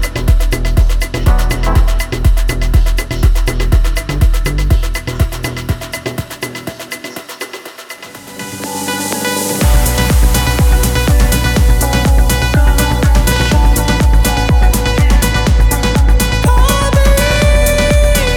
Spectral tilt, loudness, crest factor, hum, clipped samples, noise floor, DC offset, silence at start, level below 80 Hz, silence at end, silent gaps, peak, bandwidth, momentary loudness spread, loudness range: -4.5 dB/octave; -13 LUFS; 10 dB; none; under 0.1%; -30 dBFS; under 0.1%; 0 s; -12 dBFS; 0 s; none; 0 dBFS; 18 kHz; 12 LU; 9 LU